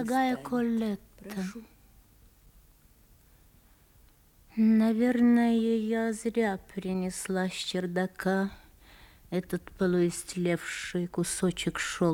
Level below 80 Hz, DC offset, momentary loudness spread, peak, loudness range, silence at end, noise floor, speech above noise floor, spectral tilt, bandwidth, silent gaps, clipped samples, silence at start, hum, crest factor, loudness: -58 dBFS; under 0.1%; 13 LU; -14 dBFS; 11 LU; 0 s; -60 dBFS; 32 dB; -5.5 dB/octave; 17 kHz; none; under 0.1%; 0 s; none; 16 dB; -29 LUFS